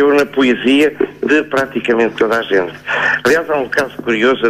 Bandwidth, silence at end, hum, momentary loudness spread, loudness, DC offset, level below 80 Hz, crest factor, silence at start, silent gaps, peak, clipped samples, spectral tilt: 14 kHz; 0 s; none; 5 LU; -14 LUFS; under 0.1%; -50 dBFS; 12 dB; 0 s; none; -2 dBFS; under 0.1%; -4.5 dB/octave